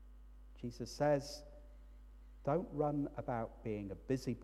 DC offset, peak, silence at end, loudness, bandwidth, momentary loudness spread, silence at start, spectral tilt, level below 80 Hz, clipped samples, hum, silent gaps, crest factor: under 0.1%; -22 dBFS; 0 s; -40 LUFS; 13.5 kHz; 25 LU; 0 s; -6.5 dB/octave; -56 dBFS; under 0.1%; none; none; 18 dB